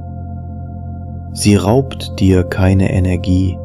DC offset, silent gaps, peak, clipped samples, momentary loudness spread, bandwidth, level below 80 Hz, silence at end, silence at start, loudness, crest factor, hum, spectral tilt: under 0.1%; none; 0 dBFS; under 0.1%; 15 LU; 12.5 kHz; -34 dBFS; 0 s; 0 s; -14 LUFS; 14 dB; none; -6.5 dB/octave